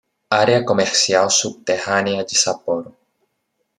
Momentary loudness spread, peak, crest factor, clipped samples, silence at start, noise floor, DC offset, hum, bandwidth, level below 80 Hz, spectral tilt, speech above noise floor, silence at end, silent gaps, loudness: 8 LU; -2 dBFS; 18 dB; under 0.1%; 0.3 s; -72 dBFS; under 0.1%; none; 13 kHz; -64 dBFS; -2 dB/octave; 54 dB; 0.9 s; none; -17 LUFS